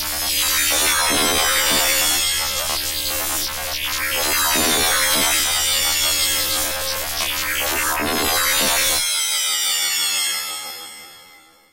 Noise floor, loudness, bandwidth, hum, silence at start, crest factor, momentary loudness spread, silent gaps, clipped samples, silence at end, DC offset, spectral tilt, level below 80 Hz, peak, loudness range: -48 dBFS; -17 LUFS; 16 kHz; none; 0 s; 16 dB; 7 LU; none; under 0.1%; 0 s; 1%; 0 dB/octave; -42 dBFS; -6 dBFS; 2 LU